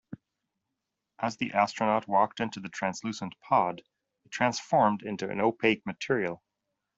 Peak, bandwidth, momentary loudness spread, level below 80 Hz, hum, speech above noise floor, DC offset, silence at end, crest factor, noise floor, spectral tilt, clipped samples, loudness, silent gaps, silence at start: -8 dBFS; 8 kHz; 12 LU; -70 dBFS; none; 57 dB; under 0.1%; 0.6 s; 22 dB; -85 dBFS; -5 dB/octave; under 0.1%; -29 LUFS; none; 0.1 s